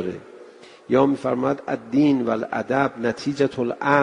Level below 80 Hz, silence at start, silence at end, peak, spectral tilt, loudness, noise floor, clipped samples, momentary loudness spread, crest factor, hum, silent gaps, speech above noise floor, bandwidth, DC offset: -60 dBFS; 0 s; 0 s; -2 dBFS; -7 dB/octave; -22 LUFS; -45 dBFS; under 0.1%; 6 LU; 20 dB; none; none; 24 dB; 10 kHz; under 0.1%